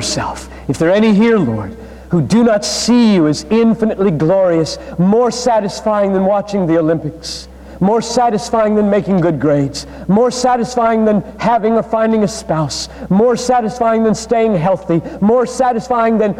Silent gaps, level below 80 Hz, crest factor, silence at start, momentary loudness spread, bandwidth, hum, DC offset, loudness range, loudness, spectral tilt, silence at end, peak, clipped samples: none; -40 dBFS; 10 dB; 0 s; 8 LU; 12.5 kHz; none; under 0.1%; 2 LU; -14 LUFS; -6 dB/octave; 0 s; -2 dBFS; under 0.1%